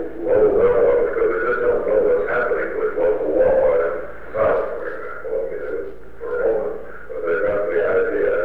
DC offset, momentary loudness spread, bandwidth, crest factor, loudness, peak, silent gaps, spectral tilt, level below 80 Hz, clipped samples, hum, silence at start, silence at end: 3%; 13 LU; 4.1 kHz; 12 dB; -20 LUFS; -8 dBFS; none; -8 dB/octave; -42 dBFS; under 0.1%; none; 0 s; 0 s